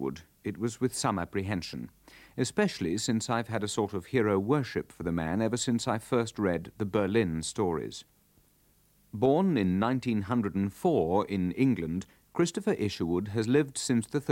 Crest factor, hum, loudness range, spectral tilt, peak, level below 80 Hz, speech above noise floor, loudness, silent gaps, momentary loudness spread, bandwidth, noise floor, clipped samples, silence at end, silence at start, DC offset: 18 dB; none; 3 LU; -5.5 dB/octave; -12 dBFS; -58 dBFS; 36 dB; -30 LUFS; none; 9 LU; 17 kHz; -66 dBFS; under 0.1%; 0 s; 0 s; under 0.1%